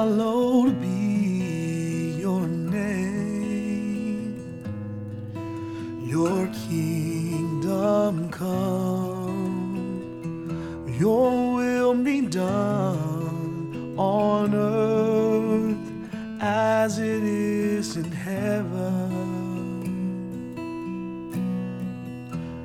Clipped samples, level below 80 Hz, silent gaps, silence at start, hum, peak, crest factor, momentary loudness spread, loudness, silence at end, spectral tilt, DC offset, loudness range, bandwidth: under 0.1%; -56 dBFS; none; 0 s; none; -10 dBFS; 14 dB; 12 LU; -26 LUFS; 0 s; -7 dB/octave; under 0.1%; 6 LU; 15.5 kHz